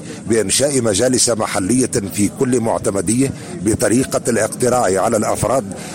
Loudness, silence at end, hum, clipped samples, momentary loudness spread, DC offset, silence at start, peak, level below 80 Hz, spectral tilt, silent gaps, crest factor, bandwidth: -16 LUFS; 0 s; none; under 0.1%; 5 LU; 0.1%; 0 s; -4 dBFS; -46 dBFS; -4 dB/octave; none; 14 dB; 16.5 kHz